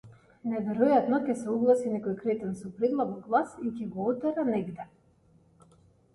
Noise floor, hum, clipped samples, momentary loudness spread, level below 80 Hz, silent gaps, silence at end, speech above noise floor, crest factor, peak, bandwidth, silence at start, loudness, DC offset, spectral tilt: -63 dBFS; none; under 0.1%; 11 LU; -68 dBFS; none; 1.3 s; 35 dB; 18 dB; -10 dBFS; 11.5 kHz; 0.05 s; -29 LUFS; under 0.1%; -7.5 dB/octave